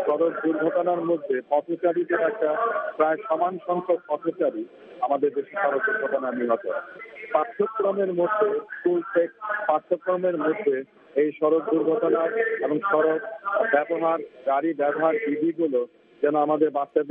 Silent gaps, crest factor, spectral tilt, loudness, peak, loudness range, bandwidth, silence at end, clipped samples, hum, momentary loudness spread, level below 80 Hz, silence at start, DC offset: none; 18 dB; -5 dB/octave; -24 LUFS; -6 dBFS; 2 LU; 3.8 kHz; 0 s; under 0.1%; none; 5 LU; -80 dBFS; 0 s; under 0.1%